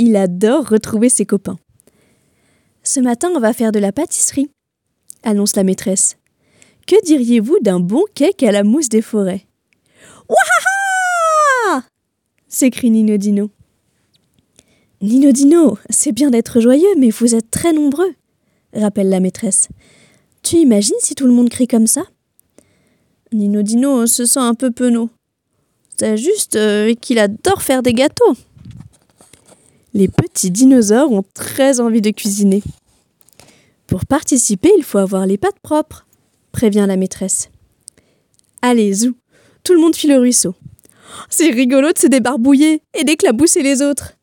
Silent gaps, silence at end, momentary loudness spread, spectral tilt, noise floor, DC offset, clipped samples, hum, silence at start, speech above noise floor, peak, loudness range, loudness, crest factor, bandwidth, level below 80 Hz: none; 0.15 s; 9 LU; -4 dB/octave; -71 dBFS; under 0.1%; under 0.1%; none; 0 s; 58 dB; 0 dBFS; 5 LU; -13 LUFS; 14 dB; 17.5 kHz; -52 dBFS